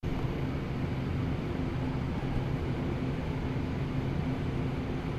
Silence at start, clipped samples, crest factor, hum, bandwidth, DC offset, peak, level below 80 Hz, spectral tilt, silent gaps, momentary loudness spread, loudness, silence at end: 0.05 s; under 0.1%; 14 dB; none; 12.5 kHz; under 0.1%; -18 dBFS; -40 dBFS; -8 dB/octave; none; 1 LU; -33 LUFS; 0 s